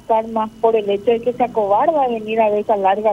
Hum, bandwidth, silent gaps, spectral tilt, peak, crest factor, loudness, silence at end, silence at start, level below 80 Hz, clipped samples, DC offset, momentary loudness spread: 50 Hz at -55 dBFS; 11.5 kHz; none; -6.5 dB/octave; -2 dBFS; 14 dB; -17 LUFS; 0 s; 0.1 s; -54 dBFS; under 0.1%; under 0.1%; 3 LU